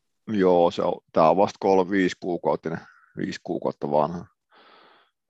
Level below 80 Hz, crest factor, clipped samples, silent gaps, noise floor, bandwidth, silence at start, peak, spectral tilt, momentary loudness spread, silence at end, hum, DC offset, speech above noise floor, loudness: -60 dBFS; 20 dB; under 0.1%; none; -58 dBFS; 8 kHz; 0.25 s; -4 dBFS; -6.5 dB/octave; 14 LU; 1.05 s; none; under 0.1%; 35 dB; -23 LUFS